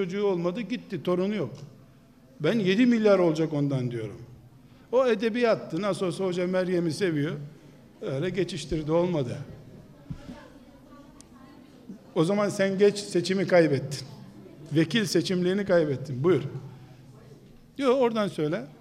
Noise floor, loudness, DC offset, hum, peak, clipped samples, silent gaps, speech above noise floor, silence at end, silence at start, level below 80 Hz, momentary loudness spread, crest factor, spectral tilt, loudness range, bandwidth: -55 dBFS; -26 LUFS; under 0.1%; none; -8 dBFS; under 0.1%; none; 29 dB; 0.1 s; 0 s; -58 dBFS; 21 LU; 18 dB; -6 dB/octave; 6 LU; 14.5 kHz